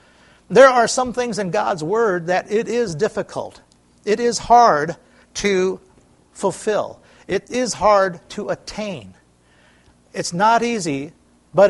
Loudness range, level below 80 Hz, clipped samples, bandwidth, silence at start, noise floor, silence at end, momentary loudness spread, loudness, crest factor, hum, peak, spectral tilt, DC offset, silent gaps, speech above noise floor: 5 LU; -52 dBFS; under 0.1%; 11.5 kHz; 0.5 s; -54 dBFS; 0 s; 18 LU; -18 LUFS; 20 dB; none; 0 dBFS; -4 dB/octave; under 0.1%; none; 36 dB